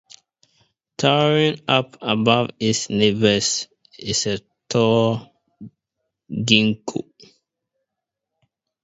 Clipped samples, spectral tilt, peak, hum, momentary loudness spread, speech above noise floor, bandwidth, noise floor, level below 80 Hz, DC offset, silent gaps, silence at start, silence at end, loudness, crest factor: under 0.1%; -4 dB/octave; 0 dBFS; none; 14 LU; 64 dB; 8 kHz; -83 dBFS; -58 dBFS; under 0.1%; none; 1 s; 1.8 s; -19 LUFS; 22 dB